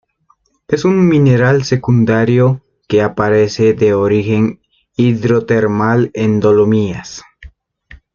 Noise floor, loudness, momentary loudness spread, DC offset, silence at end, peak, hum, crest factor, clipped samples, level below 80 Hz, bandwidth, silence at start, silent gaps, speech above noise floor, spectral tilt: -57 dBFS; -13 LUFS; 9 LU; under 0.1%; 0.7 s; 0 dBFS; none; 12 dB; under 0.1%; -46 dBFS; 7.2 kHz; 0.7 s; none; 46 dB; -7.5 dB/octave